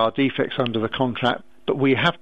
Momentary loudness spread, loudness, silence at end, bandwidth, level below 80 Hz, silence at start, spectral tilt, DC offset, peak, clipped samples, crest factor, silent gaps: 6 LU; -22 LUFS; 0.05 s; 7.8 kHz; -56 dBFS; 0 s; -7 dB/octave; 0.6%; -4 dBFS; under 0.1%; 18 dB; none